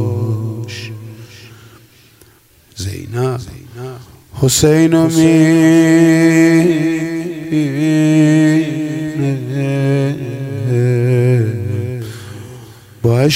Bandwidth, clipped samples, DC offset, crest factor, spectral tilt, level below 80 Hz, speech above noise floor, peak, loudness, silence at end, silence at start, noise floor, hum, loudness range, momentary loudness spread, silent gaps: 16 kHz; under 0.1%; under 0.1%; 14 dB; -6 dB/octave; -46 dBFS; 38 dB; 0 dBFS; -13 LUFS; 0 s; 0 s; -48 dBFS; none; 15 LU; 20 LU; none